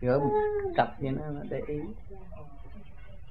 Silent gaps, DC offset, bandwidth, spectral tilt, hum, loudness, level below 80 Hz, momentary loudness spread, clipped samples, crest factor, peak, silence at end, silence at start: none; 0.8%; 5 kHz; -9.5 dB/octave; none; -30 LUFS; -48 dBFS; 24 LU; under 0.1%; 22 dB; -10 dBFS; 0 s; 0 s